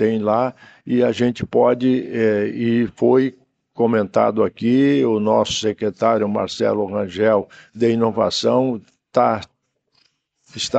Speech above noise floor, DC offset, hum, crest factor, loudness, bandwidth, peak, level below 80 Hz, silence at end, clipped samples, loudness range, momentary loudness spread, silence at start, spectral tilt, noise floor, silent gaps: 48 dB; under 0.1%; none; 16 dB; -19 LUFS; 8.6 kHz; -2 dBFS; -58 dBFS; 0 s; under 0.1%; 2 LU; 7 LU; 0 s; -5.5 dB/octave; -66 dBFS; none